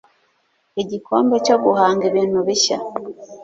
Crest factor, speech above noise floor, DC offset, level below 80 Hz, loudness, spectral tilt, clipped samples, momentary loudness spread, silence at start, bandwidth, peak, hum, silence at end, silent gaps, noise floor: 16 dB; 47 dB; under 0.1%; -62 dBFS; -18 LUFS; -3.5 dB/octave; under 0.1%; 14 LU; 0.75 s; 7.8 kHz; -2 dBFS; none; 0 s; none; -64 dBFS